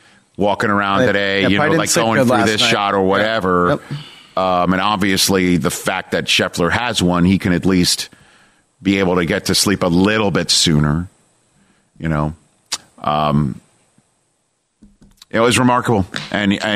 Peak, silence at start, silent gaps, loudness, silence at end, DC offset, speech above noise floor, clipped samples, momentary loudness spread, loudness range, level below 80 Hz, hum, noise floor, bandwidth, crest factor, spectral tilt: -2 dBFS; 0.4 s; none; -16 LUFS; 0 s; under 0.1%; 51 dB; under 0.1%; 9 LU; 8 LU; -42 dBFS; none; -66 dBFS; 15.5 kHz; 14 dB; -4 dB/octave